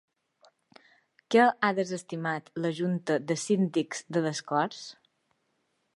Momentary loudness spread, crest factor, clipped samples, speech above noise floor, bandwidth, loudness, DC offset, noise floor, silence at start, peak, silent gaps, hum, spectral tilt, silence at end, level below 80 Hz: 10 LU; 22 dB; under 0.1%; 48 dB; 11.5 kHz; -28 LUFS; under 0.1%; -76 dBFS; 1.3 s; -8 dBFS; none; none; -5 dB/octave; 1.05 s; -82 dBFS